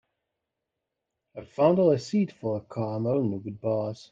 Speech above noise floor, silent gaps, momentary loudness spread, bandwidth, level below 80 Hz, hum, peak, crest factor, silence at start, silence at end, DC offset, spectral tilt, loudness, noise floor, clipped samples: 59 dB; none; 13 LU; 7.8 kHz; -68 dBFS; none; -8 dBFS; 20 dB; 1.35 s; 0.1 s; under 0.1%; -8 dB/octave; -27 LUFS; -85 dBFS; under 0.1%